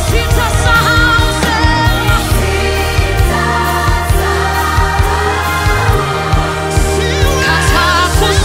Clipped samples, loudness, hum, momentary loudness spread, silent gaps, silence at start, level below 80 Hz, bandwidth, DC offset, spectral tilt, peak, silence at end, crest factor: under 0.1%; -12 LUFS; none; 4 LU; none; 0 s; -16 dBFS; 16.5 kHz; under 0.1%; -4.5 dB/octave; 0 dBFS; 0 s; 12 dB